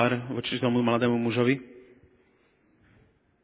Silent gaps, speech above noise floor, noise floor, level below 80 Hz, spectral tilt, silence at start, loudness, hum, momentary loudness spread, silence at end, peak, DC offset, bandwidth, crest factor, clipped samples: none; 40 dB; -65 dBFS; -66 dBFS; -5 dB/octave; 0 s; -26 LUFS; none; 6 LU; 1.65 s; -8 dBFS; under 0.1%; 4 kHz; 20 dB; under 0.1%